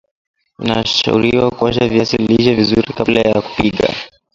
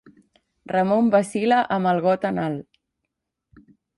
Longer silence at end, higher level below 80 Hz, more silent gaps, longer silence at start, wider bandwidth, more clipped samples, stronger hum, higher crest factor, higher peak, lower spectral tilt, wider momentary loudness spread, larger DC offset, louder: second, 0.3 s vs 1.35 s; first, -40 dBFS vs -64 dBFS; neither; about the same, 0.6 s vs 0.7 s; second, 7.6 kHz vs 11.5 kHz; neither; neither; about the same, 14 dB vs 16 dB; first, 0 dBFS vs -6 dBFS; about the same, -5.5 dB/octave vs -6.5 dB/octave; about the same, 6 LU vs 8 LU; neither; first, -14 LUFS vs -21 LUFS